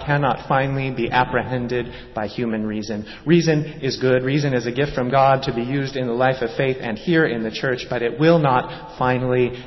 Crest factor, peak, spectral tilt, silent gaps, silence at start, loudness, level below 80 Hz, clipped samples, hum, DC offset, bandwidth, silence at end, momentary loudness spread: 16 dB; -4 dBFS; -7 dB/octave; none; 0 s; -20 LUFS; -46 dBFS; under 0.1%; none; under 0.1%; 6.2 kHz; 0 s; 9 LU